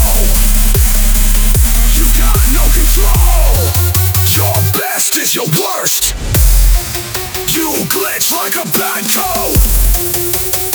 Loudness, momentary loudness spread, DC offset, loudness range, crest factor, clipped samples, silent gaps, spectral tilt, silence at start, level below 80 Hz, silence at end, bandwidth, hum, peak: -11 LUFS; 3 LU; under 0.1%; 2 LU; 10 dB; under 0.1%; none; -3.5 dB/octave; 0 s; -12 dBFS; 0 s; over 20 kHz; none; 0 dBFS